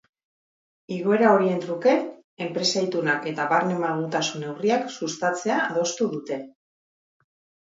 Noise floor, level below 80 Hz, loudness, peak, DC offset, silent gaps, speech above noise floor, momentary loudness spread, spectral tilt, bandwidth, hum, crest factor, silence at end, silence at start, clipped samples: under -90 dBFS; -76 dBFS; -24 LUFS; -4 dBFS; under 0.1%; 2.24-2.37 s; over 67 dB; 11 LU; -4.5 dB/octave; 7.8 kHz; none; 20 dB; 1.15 s; 0.9 s; under 0.1%